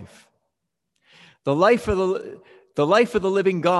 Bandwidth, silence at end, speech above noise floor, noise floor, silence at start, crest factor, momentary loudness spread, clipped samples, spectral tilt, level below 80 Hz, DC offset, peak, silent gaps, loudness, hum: 12 kHz; 0 s; 60 dB; -79 dBFS; 0 s; 18 dB; 13 LU; under 0.1%; -6 dB/octave; -48 dBFS; under 0.1%; -4 dBFS; none; -21 LUFS; none